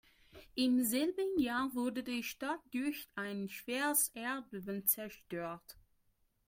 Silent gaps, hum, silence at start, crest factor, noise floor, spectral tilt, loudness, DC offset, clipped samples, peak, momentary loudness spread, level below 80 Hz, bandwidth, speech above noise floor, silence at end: none; none; 0.35 s; 22 dB; -76 dBFS; -3 dB/octave; -36 LUFS; under 0.1%; under 0.1%; -16 dBFS; 11 LU; -70 dBFS; 16.5 kHz; 39 dB; 0.7 s